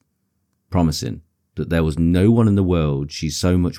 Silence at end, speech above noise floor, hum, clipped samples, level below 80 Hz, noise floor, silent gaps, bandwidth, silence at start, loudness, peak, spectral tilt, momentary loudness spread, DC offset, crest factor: 0 s; 53 dB; none; under 0.1%; -34 dBFS; -70 dBFS; none; 15.5 kHz; 0.7 s; -19 LUFS; -4 dBFS; -6.5 dB/octave; 15 LU; under 0.1%; 14 dB